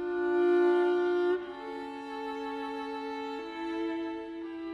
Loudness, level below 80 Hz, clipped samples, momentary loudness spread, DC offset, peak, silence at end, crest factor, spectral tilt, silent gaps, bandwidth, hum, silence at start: -31 LUFS; -68 dBFS; under 0.1%; 14 LU; under 0.1%; -18 dBFS; 0 s; 14 dB; -5 dB/octave; none; 6.6 kHz; none; 0 s